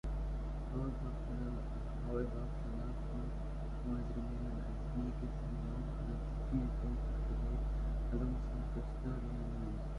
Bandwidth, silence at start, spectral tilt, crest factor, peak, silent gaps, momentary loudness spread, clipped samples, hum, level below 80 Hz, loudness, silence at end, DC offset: 6.6 kHz; 0.05 s; -9 dB/octave; 14 dB; -24 dBFS; none; 4 LU; under 0.1%; none; -40 dBFS; -42 LUFS; 0 s; under 0.1%